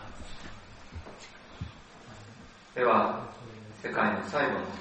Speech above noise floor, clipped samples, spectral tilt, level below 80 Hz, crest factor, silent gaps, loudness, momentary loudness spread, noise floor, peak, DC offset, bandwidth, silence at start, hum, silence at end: 22 dB; under 0.1%; -5.5 dB/octave; -54 dBFS; 22 dB; none; -29 LUFS; 23 LU; -51 dBFS; -12 dBFS; under 0.1%; 8.4 kHz; 0 s; none; 0 s